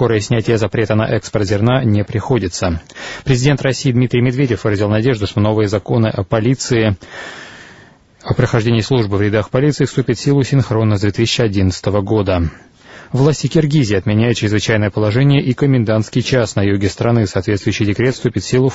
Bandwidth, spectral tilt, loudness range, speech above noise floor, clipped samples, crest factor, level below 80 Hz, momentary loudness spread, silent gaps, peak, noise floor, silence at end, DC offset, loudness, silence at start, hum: 8 kHz; -6.5 dB/octave; 3 LU; 30 dB; under 0.1%; 14 dB; -38 dBFS; 5 LU; none; 0 dBFS; -44 dBFS; 0 s; under 0.1%; -15 LUFS; 0 s; none